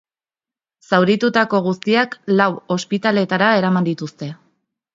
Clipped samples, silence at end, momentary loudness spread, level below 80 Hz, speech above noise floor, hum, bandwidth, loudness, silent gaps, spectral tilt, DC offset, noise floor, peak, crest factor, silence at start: under 0.1%; 0.6 s; 10 LU; -66 dBFS; over 73 dB; none; 7.6 kHz; -17 LUFS; none; -6 dB/octave; under 0.1%; under -90 dBFS; 0 dBFS; 18 dB; 0.9 s